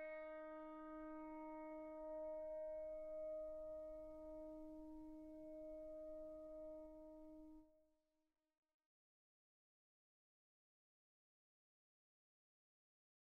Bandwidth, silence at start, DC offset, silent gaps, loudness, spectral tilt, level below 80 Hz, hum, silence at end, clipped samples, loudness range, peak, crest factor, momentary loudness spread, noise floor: 5 kHz; 0 s; under 0.1%; none; -54 LUFS; -6 dB/octave; -74 dBFS; none; 5.5 s; under 0.1%; 10 LU; -44 dBFS; 12 dB; 9 LU; -85 dBFS